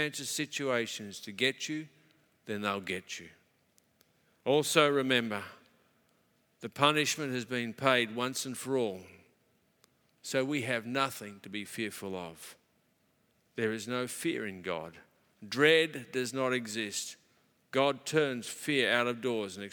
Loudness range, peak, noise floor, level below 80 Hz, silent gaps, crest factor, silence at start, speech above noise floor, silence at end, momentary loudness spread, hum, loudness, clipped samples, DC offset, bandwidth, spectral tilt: 7 LU; -8 dBFS; -72 dBFS; -82 dBFS; none; 26 dB; 0 s; 40 dB; 0 s; 16 LU; none; -32 LUFS; under 0.1%; under 0.1%; 19.5 kHz; -3.5 dB/octave